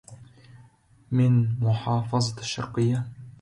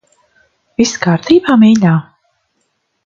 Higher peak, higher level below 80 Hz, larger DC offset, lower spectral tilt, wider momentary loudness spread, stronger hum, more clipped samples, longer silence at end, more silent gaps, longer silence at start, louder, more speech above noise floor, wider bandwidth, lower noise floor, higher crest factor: second, -12 dBFS vs 0 dBFS; about the same, -56 dBFS vs -52 dBFS; neither; about the same, -6.5 dB/octave vs -6 dB/octave; about the same, 9 LU vs 9 LU; neither; neither; second, 0.1 s vs 1.05 s; neither; second, 0.1 s vs 0.8 s; second, -25 LUFS vs -11 LUFS; second, 33 dB vs 56 dB; first, 10.5 kHz vs 7.4 kHz; second, -56 dBFS vs -65 dBFS; about the same, 14 dB vs 14 dB